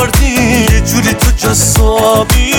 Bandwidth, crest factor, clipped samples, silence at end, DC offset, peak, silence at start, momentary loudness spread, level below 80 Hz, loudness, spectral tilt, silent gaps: over 20 kHz; 8 dB; under 0.1%; 0 s; under 0.1%; 0 dBFS; 0 s; 2 LU; -14 dBFS; -9 LUFS; -4 dB/octave; none